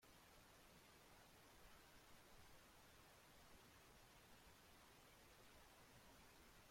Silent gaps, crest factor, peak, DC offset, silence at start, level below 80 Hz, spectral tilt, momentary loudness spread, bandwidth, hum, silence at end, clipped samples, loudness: none; 14 dB; -54 dBFS; under 0.1%; 0 s; -78 dBFS; -3 dB/octave; 1 LU; 16.5 kHz; none; 0 s; under 0.1%; -68 LUFS